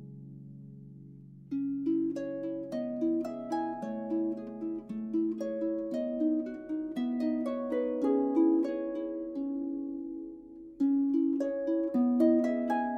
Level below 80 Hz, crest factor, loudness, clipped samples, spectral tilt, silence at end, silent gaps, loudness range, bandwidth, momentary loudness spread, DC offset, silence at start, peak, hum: -68 dBFS; 18 dB; -32 LUFS; under 0.1%; -8 dB/octave; 0 s; none; 4 LU; 6.6 kHz; 21 LU; under 0.1%; 0 s; -14 dBFS; none